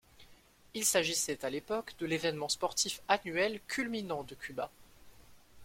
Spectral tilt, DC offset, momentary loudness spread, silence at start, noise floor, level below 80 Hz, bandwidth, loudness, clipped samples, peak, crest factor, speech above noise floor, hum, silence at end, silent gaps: -2 dB/octave; under 0.1%; 11 LU; 0.2 s; -61 dBFS; -66 dBFS; 16.5 kHz; -34 LUFS; under 0.1%; -10 dBFS; 26 dB; 26 dB; none; 0 s; none